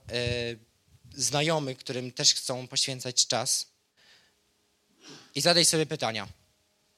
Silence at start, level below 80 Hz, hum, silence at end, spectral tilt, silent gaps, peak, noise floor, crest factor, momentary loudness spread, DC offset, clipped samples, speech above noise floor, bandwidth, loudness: 0.05 s; -60 dBFS; none; 0.65 s; -2 dB/octave; none; -4 dBFS; -71 dBFS; 26 dB; 15 LU; under 0.1%; under 0.1%; 43 dB; 16 kHz; -26 LUFS